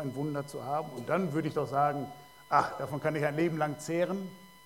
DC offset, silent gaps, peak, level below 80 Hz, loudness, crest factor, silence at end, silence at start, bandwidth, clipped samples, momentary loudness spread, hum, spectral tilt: under 0.1%; none; -12 dBFS; -68 dBFS; -32 LUFS; 20 dB; 0.1 s; 0 s; 17 kHz; under 0.1%; 9 LU; none; -6.5 dB/octave